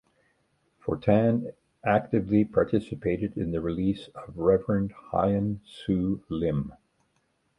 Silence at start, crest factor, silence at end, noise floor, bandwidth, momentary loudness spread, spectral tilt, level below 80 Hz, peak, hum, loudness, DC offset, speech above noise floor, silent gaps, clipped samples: 0.85 s; 20 dB; 0.85 s; -72 dBFS; 9.8 kHz; 10 LU; -9.5 dB/octave; -50 dBFS; -8 dBFS; none; -27 LUFS; under 0.1%; 46 dB; none; under 0.1%